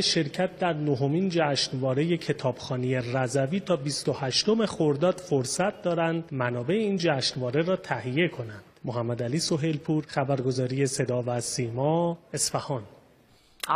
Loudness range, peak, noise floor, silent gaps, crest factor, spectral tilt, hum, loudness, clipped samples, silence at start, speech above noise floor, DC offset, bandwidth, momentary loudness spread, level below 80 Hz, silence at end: 2 LU; -10 dBFS; -59 dBFS; none; 18 dB; -5 dB/octave; none; -27 LUFS; under 0.1%; 0 s; 32 dB; under 0.1%; 15.5 kHz; 5 LU; -64 dBFS; 0 s